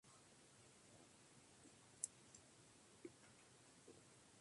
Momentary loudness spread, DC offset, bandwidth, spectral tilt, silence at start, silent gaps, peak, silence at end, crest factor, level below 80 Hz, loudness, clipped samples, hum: 15 LU; under 0.1%; 11.5 kHz; -2 dB/octave; 0.05 s; none; -26 dBFS; 0 s; 36 dB; -88 dBFS; -61 LUFS; under 0.1%; none